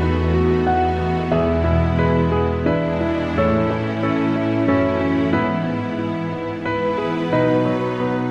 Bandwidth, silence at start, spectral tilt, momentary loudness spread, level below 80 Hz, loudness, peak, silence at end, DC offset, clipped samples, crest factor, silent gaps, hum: 7.6 kHz; 0 s; -8.5 dB/octave; 5 LU; -32 dBFS; -19 LUFS; -4 dBFS; 0 s; under 0.1%; under 0.1%; 14 dB; none; none